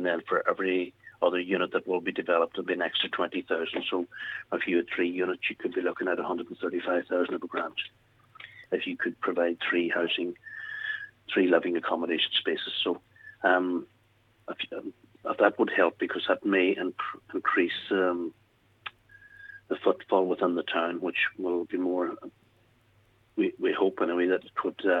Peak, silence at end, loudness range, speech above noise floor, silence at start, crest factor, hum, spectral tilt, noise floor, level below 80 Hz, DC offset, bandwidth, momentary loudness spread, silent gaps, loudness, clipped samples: -6 dBFS; 0 s; 3 LU; 37 dB; 0 s; 22 dB; none; -6.5 dB/octave; -65 dBFS; -76 dBFS; under 0.1%; 5.2 kHz; 12 LU; none; -29 LUFS; under 0.1%